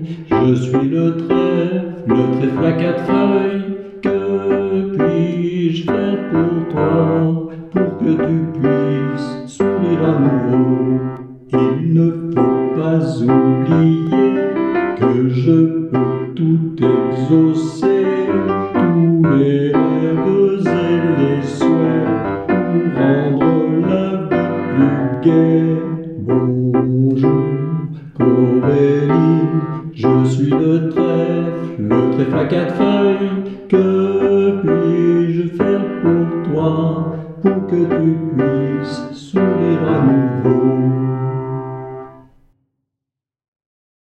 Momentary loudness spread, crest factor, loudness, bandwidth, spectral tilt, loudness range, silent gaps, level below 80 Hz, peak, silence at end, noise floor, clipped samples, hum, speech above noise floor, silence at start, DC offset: 7 LU; 14 dB; -15 LUFS; 8.4 kHz; -9 dB/octave; 3 LU; none; -50 dBFS; 0 dBFS; 2 s; -84 dBFS; under 0.1%; none; 69 dB; 0 s; under 0.1%